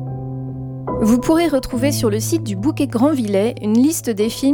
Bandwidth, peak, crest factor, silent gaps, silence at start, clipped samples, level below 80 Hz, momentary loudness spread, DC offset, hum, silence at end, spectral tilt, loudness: 18.5 kHz; -4 dBFS; 14 dB; none; 0 s; under 0.1%; -42 dBFS; 12 LU; under 0.1%; none; 0 s; -5.5 dB/octave; -18 LUFS